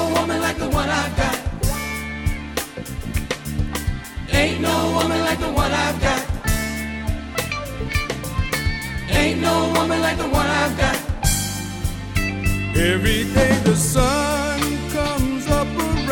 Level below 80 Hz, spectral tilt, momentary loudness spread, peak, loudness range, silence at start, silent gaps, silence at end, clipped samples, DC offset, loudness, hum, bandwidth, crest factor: -28 dBFS; -4.5 dB/octave; 9 LU; -2 dBFS; 5 LU; 0 s; none; 0 s; under 0.1%; under 0.1%; -21 LUFS; none; 17.5 kHz; 18 dB